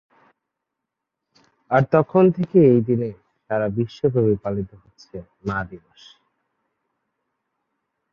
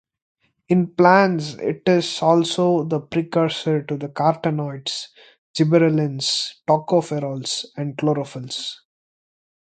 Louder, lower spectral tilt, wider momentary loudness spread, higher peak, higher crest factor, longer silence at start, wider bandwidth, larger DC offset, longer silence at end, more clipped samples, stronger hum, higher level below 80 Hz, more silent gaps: about the same, -20 LUFS vs -20 LUFS; first, -9.5 dB/octave vs -5.5 dB/octave; first, 20 LU vs 12 LU; about the same, -2 dBFS vs 0 dBFS; about the same, 20 dB vs 20 dB; first, 1.7 s vs 0.7 s; second, 6.8 kHz vs 9.4 kHz; neither; first, 2.35 s vs 0.95 s; neither; neither; first, -54 dBFS vs -64 dBFS; second, none vs 5.38-5.54 s